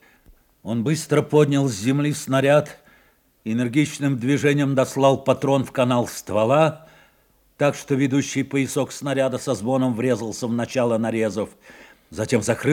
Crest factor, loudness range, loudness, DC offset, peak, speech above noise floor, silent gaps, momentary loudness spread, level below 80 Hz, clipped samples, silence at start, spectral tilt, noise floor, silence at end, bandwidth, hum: 18 dB; 3 LU; -21 LUFS; under 0.1%; -4 dBFS; 39 dB; none; 7 LU; -62 dBFS; under 0.1%; 0.65 s; -6 dB/octave; -60 dBFS; 0 s; 17 kHz; none